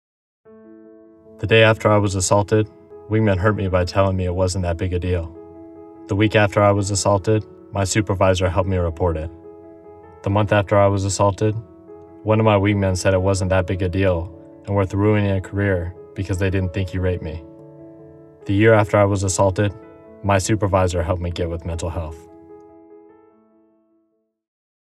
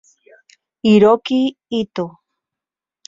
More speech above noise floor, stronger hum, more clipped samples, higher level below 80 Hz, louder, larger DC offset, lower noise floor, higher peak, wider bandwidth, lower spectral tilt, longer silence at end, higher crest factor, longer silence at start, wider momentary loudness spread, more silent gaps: second, 49 dB vs 73 dB; neither; neither; first, -40 dBFS vs -58 dBFS; second, -19 LUFS vs -16 LUFS; neither; second, -67 dBFS vs -88 dBFS; about the same, -2 dBFS vs -2 dBFS; first, 12.5 kHz vs 7.6 kHz; second, -5.5 dB/octave vs -7 dB/octave; first, 1.9 s vs 1 s; about the same, 18 dB vs 16 dB; second, 0.7 s vs 0.85 s; about the same, 14 LU vs 14 LU; neither